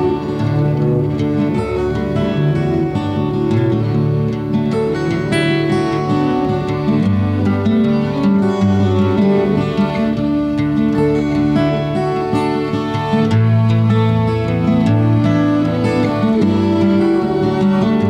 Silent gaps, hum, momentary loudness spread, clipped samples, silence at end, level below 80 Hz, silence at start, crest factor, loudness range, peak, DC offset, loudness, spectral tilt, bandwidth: none; none; 4 LU; under 0.1%; 0 s; -38 dBFS; 0 s; 12 dB; 2 LU; -2 dBFS; under 0.1%; -15 LUFS; -8.5 dB/octave; 10 kHz